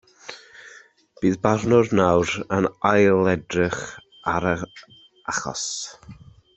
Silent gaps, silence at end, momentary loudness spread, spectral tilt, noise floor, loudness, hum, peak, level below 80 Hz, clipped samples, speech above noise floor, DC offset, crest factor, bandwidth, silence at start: none; 0.45 s; 19 LU; -5 dB/octave; -50 dBFS; -22 LUFS; none; -4 dBFS; -54 dBFS; under 0.1%; 29 dB; under 0.1%; 20 dB; 8.4 kHz; 0.25 s